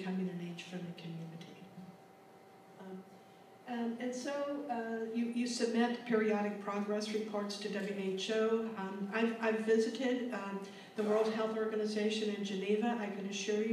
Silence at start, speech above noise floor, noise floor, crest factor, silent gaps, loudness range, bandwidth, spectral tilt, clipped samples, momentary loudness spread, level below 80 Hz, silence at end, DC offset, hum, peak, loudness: 0 s; 24 dB; -59 dBFS; 18 dB; none; 11 LU; 13.5 kHz; -5 dB/octave; under 0.1%; 15 LU; under -90 dBFS; 0 s; under 0.1%; none; -20 dBFS; -36 LUFS